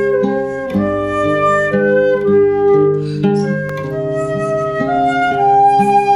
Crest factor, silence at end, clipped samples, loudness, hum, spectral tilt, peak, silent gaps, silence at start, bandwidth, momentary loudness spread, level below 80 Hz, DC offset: 10 dB; 0 s; under 0.1%; -14 LUFS; none; -7.5 dB/octave; -2 dBFS; none; 0 s; 11 kHz; 8 LU; -44 dBFS; under 0.1%